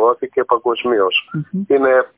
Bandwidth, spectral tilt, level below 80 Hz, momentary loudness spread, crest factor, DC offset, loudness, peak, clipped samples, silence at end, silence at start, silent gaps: 4 kHz; -9.5 dB/octave; -60 dBFS; 8 LU; 14 dB; under 0.1%; -16 LUFS; -2 dBFS; under 0.1%; 0.1 s; 0 s; none